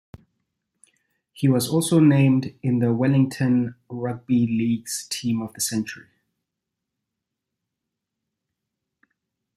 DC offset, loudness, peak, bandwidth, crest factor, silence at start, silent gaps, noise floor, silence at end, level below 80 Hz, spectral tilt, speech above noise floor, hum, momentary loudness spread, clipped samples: under 0.1%; -22 LUFS; -6 dBFS; 15 kHz; 18 dB; 1.35 s; none; -83 dBFS; 3.55 s; -64 dBFS; -6 dB/octave; 62 dB; none; 13 LU; under 0.1%